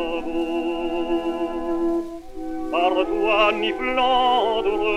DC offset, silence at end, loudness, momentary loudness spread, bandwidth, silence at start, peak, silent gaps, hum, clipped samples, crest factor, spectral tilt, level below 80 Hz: under 0.1%; 0 s; -22 LUFS; 9 LU; 10.5 kHz; 0 s; -6 dBFS; none; none; under 0.1%; 16 dB; -4.5 dB/octave; -44 dBFS